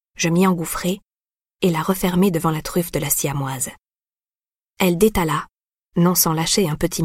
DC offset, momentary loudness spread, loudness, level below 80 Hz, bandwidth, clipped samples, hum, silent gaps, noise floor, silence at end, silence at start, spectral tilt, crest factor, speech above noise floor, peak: under 0.1%; 9 LU; -20 LUFS; -42 dBFS; 16.5 kHz; under 0.1%; none; none; under -90 dBFS; 0 s; 0.2 s; -4.5 dB/octave; 18 dB; over 71 dB; -2 dBFS